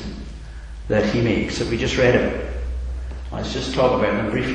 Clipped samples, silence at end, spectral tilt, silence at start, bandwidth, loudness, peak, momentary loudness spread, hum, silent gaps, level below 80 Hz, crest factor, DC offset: under 0.1%; 0 s; -6 dB/octave; 0 s; 10 kHz; -21 LUFS; -4 dBFS; 18 LU; none; none; -32 dBFS; 18 dB; under 0.1%